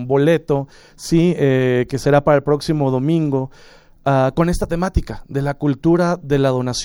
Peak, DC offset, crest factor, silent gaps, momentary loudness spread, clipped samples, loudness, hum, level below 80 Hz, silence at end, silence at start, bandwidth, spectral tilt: -2 dBFS; under 0.1%; 14 dB; none; 8 LU; under 0.1%; -17 LUFS; none; -32 dBFS; 0 s; 0 s; 17 kHz; -7 dB/octave